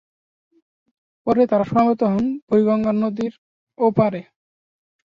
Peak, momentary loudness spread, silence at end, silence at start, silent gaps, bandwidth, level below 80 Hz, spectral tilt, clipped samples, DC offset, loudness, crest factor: -4 dBFS; 10 LU; 0.85 s; 1.25 s; 2.42-2.47 s, 3.38-3.67 s; 6.8 kHz; -56 dBFS; -9.5 dB/octave; under 0.1%; under 0.1%; -19 LUFS; 18 dB